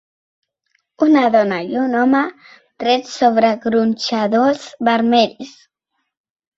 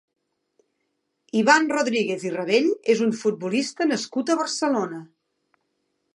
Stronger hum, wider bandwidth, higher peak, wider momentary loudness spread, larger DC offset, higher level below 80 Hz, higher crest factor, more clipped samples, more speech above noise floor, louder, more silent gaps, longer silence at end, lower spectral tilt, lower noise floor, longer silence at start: neither; second, 7.8 kHz vs 11.5 kHz; about the same, -2 dBFS vs -2 dBFS; about the same, 7 LU vs 9 LU; neither; first, -62 dBFS vs -78 dBFS; second, 16 dB vs 22 dB; neither; first, 58 dB vs 53 dB; first, -16 LUFS vs -22 LUFS; neither; about the same, 1.1 s vs 1.1 s; about the same, -5 dB/octave vs -4 dB/octave; about the same, -73 dBFS vs -75 dBFS; second, 1 s vs 1.35 s